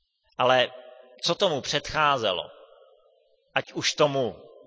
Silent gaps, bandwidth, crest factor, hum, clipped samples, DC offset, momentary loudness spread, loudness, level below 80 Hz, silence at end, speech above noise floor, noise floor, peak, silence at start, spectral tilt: none; 8 kHz; 20 dB; none; under 0.1%; under 0.1%; 9 LU; -25 LUFS; -60 dBFS; 0.2 s; 39 dB; -64 dBFS; -6 dBFS; 0.4 s; -3 dB/octave